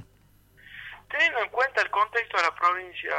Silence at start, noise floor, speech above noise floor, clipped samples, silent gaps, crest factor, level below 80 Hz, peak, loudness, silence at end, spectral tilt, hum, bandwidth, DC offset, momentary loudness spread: 0 s; -59 dBFS; 34 dB; under 0.1%; none; 20 dB; -64 dBFS; -8 dBFS; -25 LUFS; 0 s; -1.5 dB/octave; 50 Hz at -60 dBFS; 16.5 kHz; under 0.1%; 19 LU